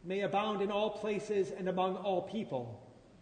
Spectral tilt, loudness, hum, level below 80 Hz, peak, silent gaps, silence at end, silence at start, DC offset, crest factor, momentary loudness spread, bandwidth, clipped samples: -6 dB/octave; -35 LUFS; none; -70 dBFS; -20 dBFS; none; 0 s; 0 s; under 0.1%; 16 dB; 7 LU; 9.6 kHz; under 0.1%